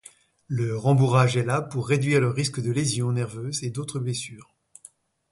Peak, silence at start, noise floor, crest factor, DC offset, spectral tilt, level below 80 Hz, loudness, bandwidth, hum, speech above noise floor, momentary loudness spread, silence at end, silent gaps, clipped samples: -6 dBFS; 0.5 s; -53 dBFS; 18 dB; under 0.1%; -5.5 dB/octave; -60 dBFS; -24 LUFS; 11.5 kHz; none; 30 dB; 10 LU; 0.9 s; none; under 0.1%